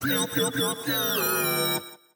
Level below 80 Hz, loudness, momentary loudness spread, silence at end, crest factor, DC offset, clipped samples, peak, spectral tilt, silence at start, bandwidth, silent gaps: -68 dBFS; -25 LUFS; 3 LU; 0.2 s; 14 dB; under 0.1%; under 0.1%; -12 dBFS; -2.5 dB/octave; 0 s; 19 kHz; none